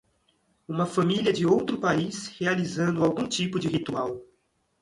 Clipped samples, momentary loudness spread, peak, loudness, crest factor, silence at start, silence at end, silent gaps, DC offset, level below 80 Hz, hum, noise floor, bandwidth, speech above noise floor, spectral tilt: under 0.1%; 8 LU; -10 dBFS; -26 LUFS; 18 dB; 0.7 s; 0.6 s; none; under 0.1%; -62 dBFS; none; -71 dBFS; 11.5 kHz; 45 dB; -5.5 dB/octave